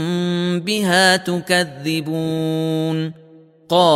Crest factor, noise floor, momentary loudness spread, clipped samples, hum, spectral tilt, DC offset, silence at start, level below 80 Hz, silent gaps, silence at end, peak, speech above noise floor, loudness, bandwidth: 18 dB; -46 dBFS; 9 LU; under 0.1%; none; -4.5 dB/octave; under 0.1%; 0 s; -62 dBFS; none; 0 s; 0 dBFS; 27 dB; -18 LUFS; 15.5 kHz